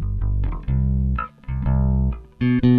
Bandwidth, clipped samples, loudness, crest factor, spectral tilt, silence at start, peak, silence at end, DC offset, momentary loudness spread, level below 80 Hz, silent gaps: 4.6 kHz; under 0.1%; -23 LUFS; 12 dB; -11 dB/octave; 0 s; -6 dBFS; 0 s; under 0.1%; 7 LU; -24 dBFS; none